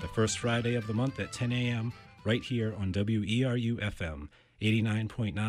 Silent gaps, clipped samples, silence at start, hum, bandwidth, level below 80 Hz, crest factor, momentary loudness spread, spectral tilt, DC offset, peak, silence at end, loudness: none; under 0.1%; 0 s; none; 11.5 kHz; -52 dBFS; 16 dB; 10 LU; -5.5 dB/octave; under 0.1%; -16 dBFS; 0 s; -31 LUFS